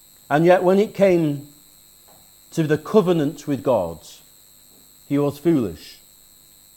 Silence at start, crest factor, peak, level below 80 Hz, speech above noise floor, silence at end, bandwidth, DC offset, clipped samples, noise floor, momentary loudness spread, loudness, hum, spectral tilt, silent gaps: 0.3 s; 20 dB; -2 dBFS; -58 dBFS; 32 dB; 0.85 s; 17.5 kHz; under 0.1%; under 0.1%; -50 dBFS; 14 LU; -20 LUFS; none; -7 dB/octave; none